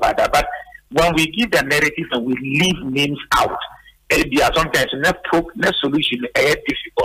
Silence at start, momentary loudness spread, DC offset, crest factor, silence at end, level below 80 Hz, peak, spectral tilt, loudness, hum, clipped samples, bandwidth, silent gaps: 0 s; 6 LU; under 0.1%; 14 dB; 0 s; -38 dBFS; -4 dBFS; -4 dB/octave; -17 LUFS; none; under 0.1%; 16 kHz; none